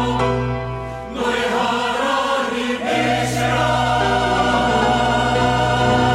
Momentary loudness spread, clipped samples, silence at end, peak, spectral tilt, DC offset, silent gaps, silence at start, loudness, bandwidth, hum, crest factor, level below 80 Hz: 6 LU; under 0.1%; 0 s; -6 dBFS; -5 dB/octave; under 0.1%; none; 0 s; -18 LUFS; 15.5 kHz; none; 12 dB; -34 dBFS